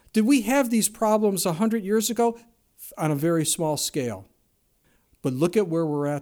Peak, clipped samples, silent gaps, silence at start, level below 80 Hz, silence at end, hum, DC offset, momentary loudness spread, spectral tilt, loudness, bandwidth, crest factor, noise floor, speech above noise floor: -8 dBFS; under 0.1%; none; 0.15 s; -62 dBFS; 0 s; none; under 0.1%; 11 LU; -4.5 dB/octave; -23 LUFS; over 20 kHz; 18 dB; -67 dBFS; 44 dB